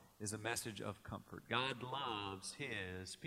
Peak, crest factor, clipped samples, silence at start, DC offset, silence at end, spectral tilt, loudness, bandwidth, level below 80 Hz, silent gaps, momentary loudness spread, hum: -22 dBFS; 24 dB; under 0.1%; 0 s; under 0.1%; 0 s; -3 dB/octave; -44 LUFS; 16 kHz; -74 dBFS; none; 9 LU; none